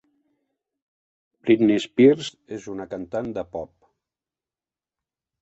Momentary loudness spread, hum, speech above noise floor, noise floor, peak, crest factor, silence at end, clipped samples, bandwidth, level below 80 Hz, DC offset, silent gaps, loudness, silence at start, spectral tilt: 18 LU; none; over 69 dB; under -90 dBFS; -4 dBFS; 22 dB; 1.75 s; under 0.1%; 8.2 kHz; -62 dBFS; under 0.1%; none; -21 LUFS; 1.45 s; -6.5 dB/octave